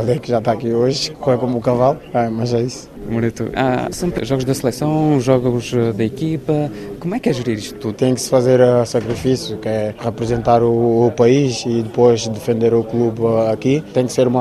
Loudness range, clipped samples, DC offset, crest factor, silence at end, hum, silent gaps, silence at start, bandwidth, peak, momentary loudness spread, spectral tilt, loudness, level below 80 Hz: 3 LU; under 0.1%; under 0.1%; 16 dB; 0 s; none; none; 0 s; 14 kHz; 0 dBFS; 8 LU; -6.5 dB/octave; -17 LUFS; -44 dBFS